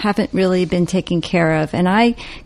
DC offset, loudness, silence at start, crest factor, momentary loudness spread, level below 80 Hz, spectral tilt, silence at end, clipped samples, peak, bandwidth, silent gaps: under 0.1%; -17 LUFS; 0 s; 14 dB; 4 LU; -42 dBFS; -6.5 dB/octave; 0.05 s; under 0.1%; -2 dBFS; 12 kHz; none